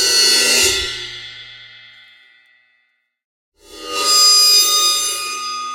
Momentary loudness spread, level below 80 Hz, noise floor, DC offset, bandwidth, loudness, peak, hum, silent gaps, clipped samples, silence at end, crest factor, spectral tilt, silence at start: 22 LU; -50 dBFS; -65 dBFS; under 0.1%; 16.5 kHz; -11 LUFS; -2 dBFS; none; 3.24-3.52 s; under 0.1%; 0 s; 16 dB; 1.5 dB/octave; 0 s